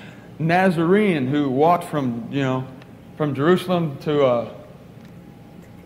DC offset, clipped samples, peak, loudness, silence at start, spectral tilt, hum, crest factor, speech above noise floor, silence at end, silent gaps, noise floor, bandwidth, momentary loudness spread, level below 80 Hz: under 0.1%; under 0.1%; -4 dBFS; -20 LUFS; 0 s; -7.5 dB/octave; none; 16 dB; 23 dB; 0.05 s; none; -42 dBFS; 16 kHz; 10 LU; -58 dBFS